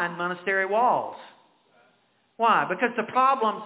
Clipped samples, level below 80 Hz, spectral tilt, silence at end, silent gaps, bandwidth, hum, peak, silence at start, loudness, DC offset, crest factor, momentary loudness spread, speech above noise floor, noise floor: under 0.1%; -84 dBFS; -8 dB/octave; 0 s; none; 4 kHz; none; -8 dBFS; 0 s; -24 LUFS; under 0.1%; 18 dB; 7 LU; 42 dB; -66 dBFS